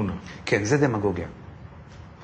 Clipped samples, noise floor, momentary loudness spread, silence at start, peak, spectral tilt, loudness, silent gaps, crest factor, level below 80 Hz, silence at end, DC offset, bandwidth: under 0.1%; -44 dBFS; 23 LU; 0 s; -8 dBFS; -6 dB/octave; -25 LUFS; none; 18 dB; -48 dBFS; 0 s; under 0.1%; 9 kHz